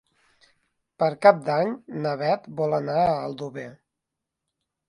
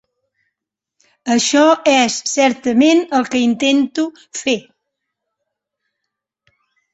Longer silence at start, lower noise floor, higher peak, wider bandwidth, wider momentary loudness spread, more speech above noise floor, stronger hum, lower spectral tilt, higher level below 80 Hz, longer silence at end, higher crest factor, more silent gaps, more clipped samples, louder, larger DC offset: second, 1 s vs 1.25 s; about the same, -84 dBFS vs -81 dBFS; about the same, -2 dBFS vs 0 dBFS; first, 11 kHz vs 8.2 kHz; first, 16 LU vs 11 LU; second, 61 dB vs 67 dB; neither; first, -7 dB/octave vs -2.5 dB/octave; about the same, -64 dBFS vs -62 dBFS; second, 1.15 s vs 2.35 s; first, 22 dB vs 16 dB; neither; neither; second, -24 LUFS vs -15 LUFS; neither